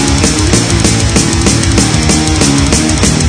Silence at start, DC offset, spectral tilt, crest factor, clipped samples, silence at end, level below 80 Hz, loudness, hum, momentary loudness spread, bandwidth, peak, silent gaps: 0 s; under 0.1%; -4 dB/octave; 8 dB; 0.5%; 0 s; -18 dBFS; -9 LUFS; none; 1 LU; 11 kHz; 0 dBFS; none